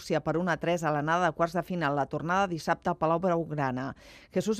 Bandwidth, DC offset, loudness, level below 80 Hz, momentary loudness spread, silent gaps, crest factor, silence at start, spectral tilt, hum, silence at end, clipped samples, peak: 14.5 kHz; under 0.1%; -29 LUFS; -58 dBFS; 6 LU; none; 18 dB; 0 s; -6 dB/octave; none; 0 s; under 0.1%; -12 dBFS